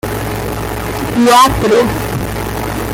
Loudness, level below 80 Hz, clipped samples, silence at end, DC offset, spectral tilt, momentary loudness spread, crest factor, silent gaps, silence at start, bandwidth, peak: -13 LUFS; -28 dBFS; under 0.1%; 0 s; under 0.1%; -5 dB/octave; 12 LU; 14 dB; none; 0.05 s; 17 kHz; 0 dBFS